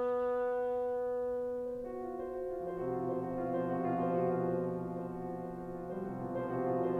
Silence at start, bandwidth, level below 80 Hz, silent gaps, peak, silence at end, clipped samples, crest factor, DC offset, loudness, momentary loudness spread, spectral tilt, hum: 0 s; 4.2 kHz; -62 dBFS; none; -22 dBFS; 0 s; under 0.1%; 14 dB; under 0.1%; -36 LUFS; 8 LU; -9.5 dB/octave; none